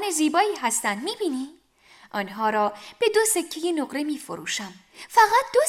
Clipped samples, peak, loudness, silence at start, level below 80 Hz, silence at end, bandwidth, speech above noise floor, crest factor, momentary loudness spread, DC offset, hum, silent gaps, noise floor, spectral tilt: under 0.1%; -4 dBFS; -24 LUFS; 0 s; -68 dBFS; 0 s; 16.5 kHz; 30 dB; 20 dB; 13 LU; under 0.1%; none; none; -54 dBFS; -2 dB/octave